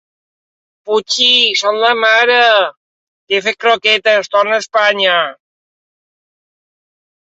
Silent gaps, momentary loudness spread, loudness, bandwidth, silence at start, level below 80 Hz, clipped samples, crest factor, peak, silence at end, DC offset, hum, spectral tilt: 2.77-3.27 s; 9 LU; -11 LUFS; 8.2 kHz; 0.85 s; -68 dBFS; under 0.1%; 14 dB; 0 dBFS; 2.05 s; under 0.1%; none; -0.5 dB/octave